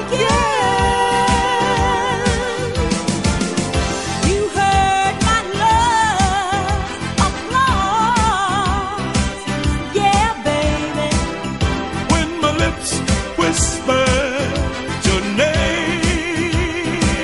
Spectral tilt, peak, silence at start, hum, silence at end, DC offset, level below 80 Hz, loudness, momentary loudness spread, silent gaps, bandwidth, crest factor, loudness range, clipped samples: -4 dB/octave; -2 dBFS; 0 s; none; 0 s; 0.4%; -26 dBFS; -17 LUFS; 5 LU; none; 11.5 kHz; 16 dB; 2 LU; under 0.1%